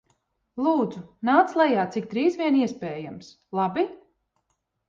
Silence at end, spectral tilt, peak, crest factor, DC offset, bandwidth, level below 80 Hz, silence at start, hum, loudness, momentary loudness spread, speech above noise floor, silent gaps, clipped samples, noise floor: 0.9 s; -6.5 dB/octave; -6 dBFS; 20 dB; under 0.1%; 7.4 kHz; -68 dBFS; 0.55 s; none; -24 LUFS; 14 LU; 52 dB; none; under 0.1%; -76 dBFS